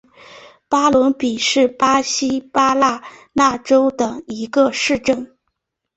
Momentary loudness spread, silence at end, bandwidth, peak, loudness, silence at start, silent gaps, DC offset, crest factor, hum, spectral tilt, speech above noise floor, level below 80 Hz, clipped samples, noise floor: 9 LU; 0.7 s; 8.2 kHz; -2 dBFS; -17 LUFS; 0.3 s; none; under 0.1%; 16 dB; none; -3 dB/octave; 58 dB; -54 dBFS; under 0.1%; -75 dBFS